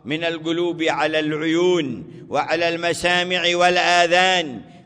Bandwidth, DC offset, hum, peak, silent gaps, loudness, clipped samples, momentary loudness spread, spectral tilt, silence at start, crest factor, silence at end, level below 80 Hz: 11 kHz; under 0.1%; none; -4 dBFS; none; -19 LUFS; under 0.1%; 9 LU; -3.5 dB/octave; 0.05 s; 16 dB; 0.1 s; -58 dBFS